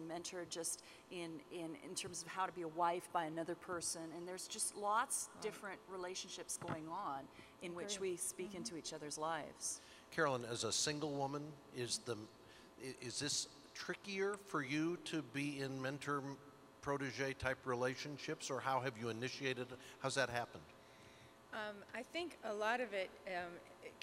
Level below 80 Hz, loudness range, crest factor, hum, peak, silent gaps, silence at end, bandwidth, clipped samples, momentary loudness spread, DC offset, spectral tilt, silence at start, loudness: -76 dBFS; 4 LU; 22 dB; none; -22 dBFS; none; 0 s; 16 kHz; under 0.1%; 12 LU; under 0.1%; -3 dB/octave; 0 s; -43 LUFS